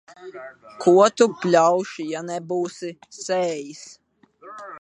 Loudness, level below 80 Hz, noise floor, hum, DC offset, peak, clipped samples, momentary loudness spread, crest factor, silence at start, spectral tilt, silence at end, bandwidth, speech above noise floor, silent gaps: -20 LUFS; -76 dBFS; -49 dBFS; none; under 0.1%; -2 dBFS; under 0.1%; 24 LU; 20 dB; 0.2 s; -5 dB/octave; 0 s; 10.5 kHz; 27 dB; none